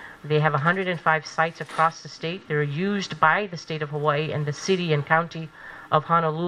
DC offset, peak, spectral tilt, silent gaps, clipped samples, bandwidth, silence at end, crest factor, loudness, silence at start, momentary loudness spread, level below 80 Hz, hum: under 0.1%; -2 dBFS; -5.5 dB/octave; none; under 0.1%; 10.5 kHz; 0 s; 22 dB; -24 LUFS; 0 s; 11 LU; -64 dBFS; none